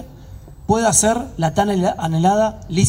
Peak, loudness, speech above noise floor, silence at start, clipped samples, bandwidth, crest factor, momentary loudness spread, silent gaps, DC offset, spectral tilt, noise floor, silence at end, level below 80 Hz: -2 dBFS; -17 LUFS; 21 dB; 0 s; under 0.1%; 16 kHz; 16 dB; 7 LU; none; under 0.1%; -4.5 dB/octave; -38 dBFS; 0 s; -40 dBFS